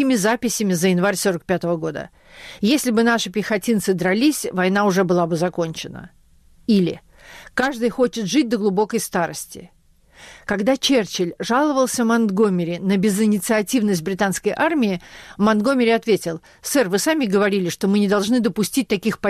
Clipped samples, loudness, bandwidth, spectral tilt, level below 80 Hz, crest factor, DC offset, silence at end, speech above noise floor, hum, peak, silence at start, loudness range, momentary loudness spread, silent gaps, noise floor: under 0.1%; -19 LUFS; 14.5 kHz; -4.5 dB/octave; -54 dBFS; 12 dB; under 0.1%; 0 s; 32 dB; none; -8 dBFS; 0 s; 3 LU; 9 LU; none; -51 dBFS